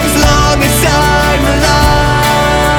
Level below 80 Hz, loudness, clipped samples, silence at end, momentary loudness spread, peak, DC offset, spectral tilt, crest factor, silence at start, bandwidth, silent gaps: -16 dBFS; -9 LUFS; under 0.1%; 0 s; 1 LU; 0 dBFS; under 0.1%; -4 dB/octave; 8 dB; 0 s; 19.5 kHz; none